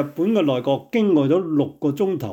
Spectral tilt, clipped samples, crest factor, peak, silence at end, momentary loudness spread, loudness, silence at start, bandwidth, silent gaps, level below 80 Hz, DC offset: -8 dB/octave; under 0.1%; 12 dB; -8 dBFS; 0 s; 5 LU; -20 LUFS; 0 s; 17.5 kHz; none; -64 dBFS; under 0.1%